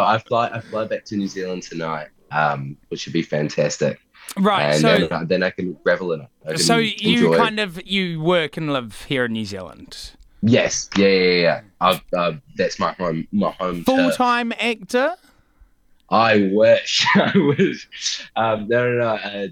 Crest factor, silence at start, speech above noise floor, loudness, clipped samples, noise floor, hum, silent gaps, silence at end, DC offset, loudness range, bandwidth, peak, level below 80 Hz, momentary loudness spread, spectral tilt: 18 dB; 0 s; 34 dB; -19 LUFS; under 0.1%; -54 dBFS; none; none; 0 s; under 0.1%; 5 LU; 18 kHz; -2 dBFS; -54 dBFS; 12 LU; -4.5 dB/octave